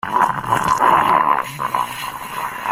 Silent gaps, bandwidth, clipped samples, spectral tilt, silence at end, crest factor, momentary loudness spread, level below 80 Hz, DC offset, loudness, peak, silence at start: none; 16 kHz; under 0.1%; -3.5 dB/octave; 0 s; 16 dB; 12 LU; -50 dBFS; under 0.1%; -18 LUFS; -2 dBFS; 0.05 s